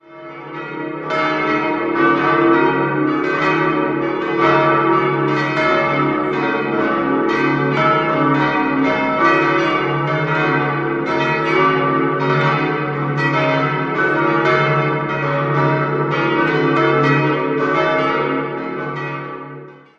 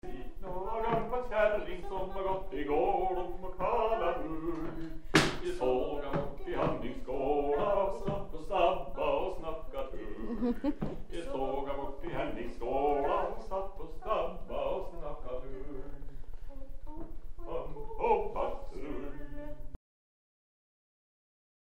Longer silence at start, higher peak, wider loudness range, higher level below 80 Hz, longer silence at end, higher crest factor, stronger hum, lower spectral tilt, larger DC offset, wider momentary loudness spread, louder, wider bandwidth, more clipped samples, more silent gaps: about the same, 0.1 s vs 0.05 s; first, 0 dBFS vs -10 dBFS; second, 1 LU vs 8 LU; second, -54 dBFS vs -44 dBFS; second, 0.2 s vs 2 s; second, 16 dB vs 22 dB; neither; first, -7.5 dB/octave vs -5.5 dB/octave; neither; second, 9 LU vs 16 LU; first, -16 LUFS vs -34 LUFS; second, 7.4 kHz vs 11.5 kHz; neither; neither